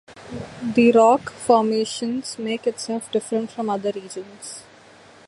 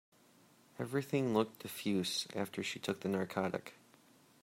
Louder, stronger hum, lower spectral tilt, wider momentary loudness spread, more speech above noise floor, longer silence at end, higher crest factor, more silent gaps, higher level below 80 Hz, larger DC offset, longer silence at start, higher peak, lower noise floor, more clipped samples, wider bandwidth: first, -21 LUFS vs -37 LUFS; neither; about the same, -4.5 dB/octave vs -5 dB/octave; first, 20 LU vs 10 LU; about the same, 27 dB vs 29 dB; about the same, 0.65 s vs 0.7 s; about the same, 18 dB vs 22 dB; neither; first, -60 dBFS vs -80 dBFS; neither; second, 0.1 s vs 0.75 s; first, -4 dBFS vs -16 dBFS; second, -48 dBFS vs -66 dBFS; neither; second, 11.5 kHz vs 16 kHz